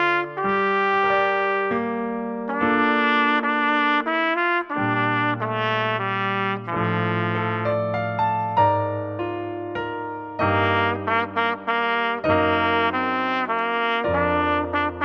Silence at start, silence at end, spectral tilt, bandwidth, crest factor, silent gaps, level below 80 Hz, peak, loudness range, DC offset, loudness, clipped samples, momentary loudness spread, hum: 0 s; 0 s; -7.5 dB/octave; 6.6 kHz; 16 dB; none; -54 dBFS; -6 dBFS; 3 LU; under 0.1%; -22 LUFS; under 0.1%; 8 LU; none